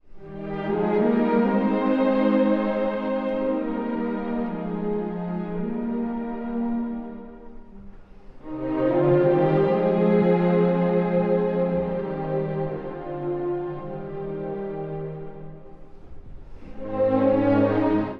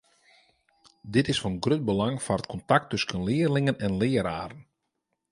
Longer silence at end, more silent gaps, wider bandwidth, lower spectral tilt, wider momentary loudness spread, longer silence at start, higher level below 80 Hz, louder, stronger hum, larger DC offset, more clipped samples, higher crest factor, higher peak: second, 0 s vs 0.7 s; neither; second, 5.2 kHz vs 11.5 kHz; first, -10.5 dB/octave vs -6 dB/octave; first, 13 LU vs 6 LU; second, 0.05 s vs 1.05 s; first, -46 dBFS vs -52 dBFS; first, -24 LUFS vs -27 LUFS; neither; neither; neither; second, 16 dB vs 22 dB; about the same, -8 dBFS vs -6 dBFS